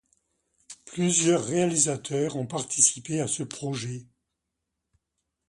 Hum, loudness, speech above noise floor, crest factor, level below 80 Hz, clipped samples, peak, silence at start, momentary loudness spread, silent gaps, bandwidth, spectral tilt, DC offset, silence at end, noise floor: none; -25 LUFS; 57 dB; 24 dB; -66 dBFS; under 0.1%; -4 dBFS; 0.7 s; 15 LU; none; 11.5 kHz; -3.5 dB/octave; under 0.1%; 1.45 s; -83 dBFS